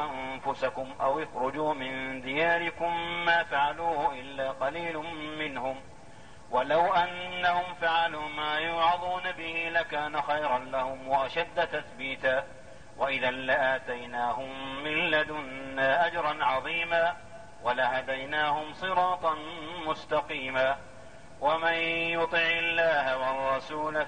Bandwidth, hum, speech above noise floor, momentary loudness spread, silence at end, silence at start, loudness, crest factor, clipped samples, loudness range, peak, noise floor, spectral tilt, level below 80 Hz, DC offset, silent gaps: 9.8 kHz; none; 22 dB; 9 LU; 0 s; 0 s; -29 LUFS; 16 dB; under 0.1%; 3 LU; -14 dBFS; -51 dBFS; -4.5 dB/octave; -60 dBFS; 0.4%; none